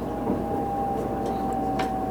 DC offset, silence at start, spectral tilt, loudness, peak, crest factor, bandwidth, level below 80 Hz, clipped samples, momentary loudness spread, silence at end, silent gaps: under 0.1%; 0 s; -7 dB/octave; -27 LUFS; -14 dBFS; 14 dB; over 20 kHz; -42 dBFS; under 0.1%; 1 LU; 0 s; none